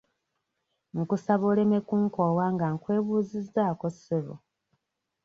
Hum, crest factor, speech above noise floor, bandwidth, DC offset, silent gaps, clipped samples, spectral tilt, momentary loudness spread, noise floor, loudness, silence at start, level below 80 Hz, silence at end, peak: none; 18 dB; 54 dB; 7.4 kHz; under 0.1%; none; under 0.1%; -9.5 dB/octave; 9 LU; -80 dBFS; -27 LUFS; 0.95 s; -68 dBFS; 0.85 s; -10 dBFS